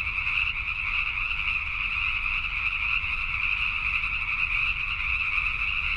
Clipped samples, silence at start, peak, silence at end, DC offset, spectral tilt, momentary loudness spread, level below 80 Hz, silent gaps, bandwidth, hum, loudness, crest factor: under 0.1%; 0 s; -12 dBFS; 0 s; under 0.1%; -3 dB/octave; 2 LU; -38 dBFS; none; 10.5 kHz; none; -25 LUFS; 14 dB